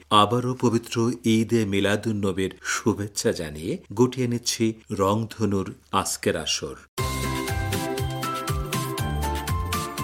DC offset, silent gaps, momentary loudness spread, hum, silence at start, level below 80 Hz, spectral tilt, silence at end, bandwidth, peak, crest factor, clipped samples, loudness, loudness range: under 0.1%; 6.88-6.97 s; 6 LU; none; 0.1 s; -40 dBFS; -4.5 dB/octave; 0 s; 16.5 kHz; -4 dBFS; 22 dB; under 0.1%; -25 LUFS; 3 LU